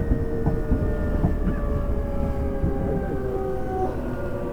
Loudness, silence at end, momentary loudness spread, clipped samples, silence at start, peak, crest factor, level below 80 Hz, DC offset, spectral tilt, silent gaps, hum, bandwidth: -26 LUFS; 0 s; 3 LU; under 0.1%; 0 s; -8 dBFS; 16 dB; -28 dBFS; under 0.1%; -9.5 dB/octave; none; none; 8.6 kHz